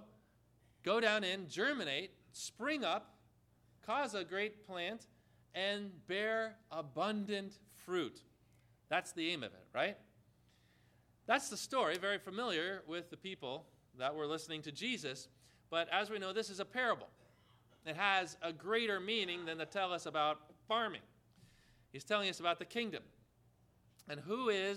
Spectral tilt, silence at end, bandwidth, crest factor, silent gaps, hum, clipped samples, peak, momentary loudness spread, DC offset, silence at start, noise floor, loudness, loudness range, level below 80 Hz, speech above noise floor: -3 dB/octave; 0 s; 16 kHz; 24 dB; none; 60 Hz at -75 dBFS; under 0.1%; -16 dBFS; 12 LU; under 0.1%; 0 s; -71 dBFS; -39 LUFS; 4 LU; -80 dBFS; 32 dB